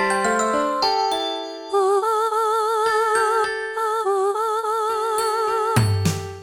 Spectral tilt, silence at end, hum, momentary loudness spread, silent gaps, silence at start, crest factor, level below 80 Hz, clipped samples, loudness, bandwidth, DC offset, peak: -4.5 dB/octave; 0 s; none; 5 LU; none; 0 s; 14 dB; -54 dBFS; under 0.1%; -21 LUFS; 19 kHz; under 0.1%; -6 dBFS